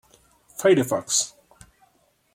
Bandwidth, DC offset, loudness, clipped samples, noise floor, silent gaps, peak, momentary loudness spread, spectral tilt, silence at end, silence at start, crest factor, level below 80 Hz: 16.5 kHz; under 0.1%; -22 LUFS; under 0.1%; -64 dBFS; none; -6 dBFS; 12 LU; -3 dB/octave; 1.05 s; 0.6 s; 20 dB; -64 dBFS